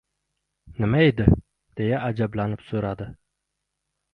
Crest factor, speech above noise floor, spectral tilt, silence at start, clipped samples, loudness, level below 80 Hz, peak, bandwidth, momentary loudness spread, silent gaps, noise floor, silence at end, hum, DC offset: 24 dB; 58 dB; -9.5 dB/octave; 0.65 s; under 0.1%; -23 LUFS; -38 dBFS; 0 dBFS; 5 kHz; 18 LU; none; -80 dBFS; 1 s; none; under 0.1%